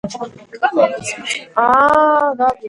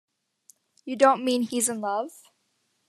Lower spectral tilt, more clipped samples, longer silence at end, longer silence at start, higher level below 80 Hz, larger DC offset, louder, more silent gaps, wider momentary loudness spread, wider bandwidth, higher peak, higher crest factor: about the same, -3.5 dB/octave vs -2.5 dB/octave; neither; second, 0 s vs 0.8 s; second, 0.05 s vs 0.85 s; first, -52 dBFS vs -82 dBFS; neither; first, -15 LUFS vs -24 LUFS; neither; about the same, 15 LU vs 17 LU; second, 11.5 kHz vs 14 kHz; first, 0 dBFS vs -6 dBFS; second, 16 dB vs 22 dB